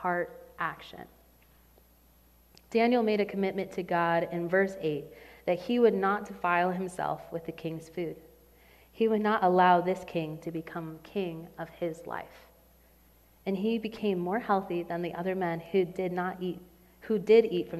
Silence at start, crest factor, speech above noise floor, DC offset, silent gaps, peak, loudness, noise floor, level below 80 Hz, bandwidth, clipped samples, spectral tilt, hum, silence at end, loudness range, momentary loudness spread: 0 s; 20 dB; 32 dB; under 0.1%; none; -10 dBFS; -30 LUFS; -61 dBFS; -64 dBFS; 14.5 kHz; under 0.1%; -7 dB/octave; none; 0 s; 7 LU; 16 LU